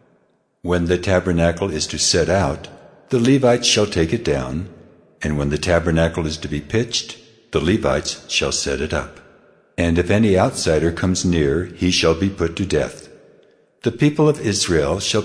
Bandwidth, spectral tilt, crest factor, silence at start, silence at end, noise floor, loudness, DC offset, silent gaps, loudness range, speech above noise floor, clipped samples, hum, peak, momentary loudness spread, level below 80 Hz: 11 kHz; -4.5 dB/octave; 16 dB; 0.65 s; 0 s; -61 dBFS; -19 LUFS; under 0.1%; none; 4 LU; 43 dB; under 0.1%; none; -2 dBFS; 10 LU; -36 dBFS